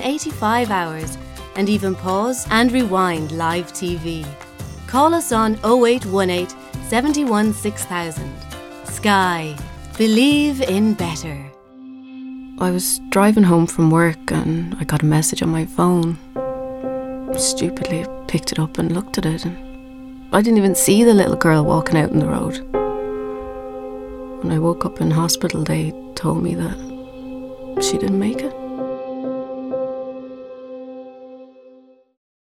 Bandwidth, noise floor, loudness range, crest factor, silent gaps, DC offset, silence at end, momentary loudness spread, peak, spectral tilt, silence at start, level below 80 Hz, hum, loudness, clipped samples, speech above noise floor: 16.5 kHz; -48 dBFS; 7 LU; 20 dB; none; under 0.1%; 0.75 s; 19 LU; 0 dBFS; -5 dB/octave; 0 s; -42 dBFS; none; -19 LUFS; under 0.1%; 31 dB